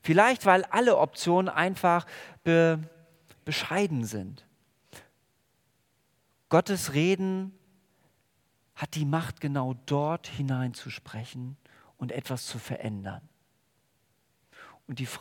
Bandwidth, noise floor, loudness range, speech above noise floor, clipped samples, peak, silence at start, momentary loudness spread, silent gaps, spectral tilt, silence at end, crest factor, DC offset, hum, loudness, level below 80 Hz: 18 kHz; -72 dBFS; 13 LU; 44 dB; under 0.1%; -6 dBFS; 0.05 s; 18 LU; none; -5.5 dB/octave; 0 s; 24 dB; under 0.1%; none; -27 LUFS; -70 dBFS